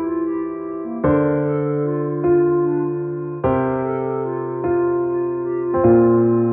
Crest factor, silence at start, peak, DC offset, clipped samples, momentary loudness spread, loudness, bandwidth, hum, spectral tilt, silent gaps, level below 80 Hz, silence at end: 14 dB; 0 s; -4 dBFS; under 0.1%; under 0.1%; 9 LU; -19 LUFS; 3.2 kHz; none; -10.5 dB/octave; none; -46 dBFS; 0 s